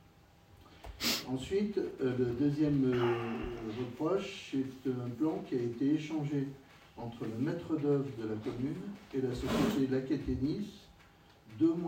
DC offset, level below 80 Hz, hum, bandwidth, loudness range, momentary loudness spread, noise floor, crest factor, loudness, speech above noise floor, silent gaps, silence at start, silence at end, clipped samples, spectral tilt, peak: under 0.1%; -56 dBFS; none; 16 kHz; 3 LU; 11 LU; -61 dBFS; 16 dB; -34 LUFS; 28 dB; none; 0.55 s; 0 s; under 0.1%; -6 dB/octave; -18 dBFS